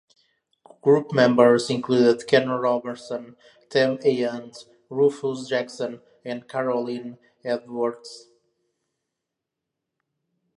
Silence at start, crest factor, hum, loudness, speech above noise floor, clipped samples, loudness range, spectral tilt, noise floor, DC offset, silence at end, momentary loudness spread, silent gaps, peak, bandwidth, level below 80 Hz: 0.85 s; 22 dB; none; -22 LUFS; 62 dB; under 0.1%; 12 LU; -5.5 dB/octave; -84 dBFS; under 0.1%; 2.4 s; 17 LU; none; -2 dBFS; 11 kHz; -74 dBFS